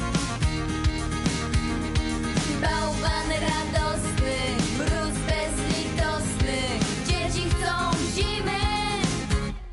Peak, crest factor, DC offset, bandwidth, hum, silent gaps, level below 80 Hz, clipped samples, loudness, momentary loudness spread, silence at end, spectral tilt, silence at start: -12 dBFS; 14 dB; under 0.1%; 11.5 kHz; none; none; -32 dBFS; under 0.1%; -26 LUFS; 2 LU; 0 s; -4.5 dB/octave; 0 s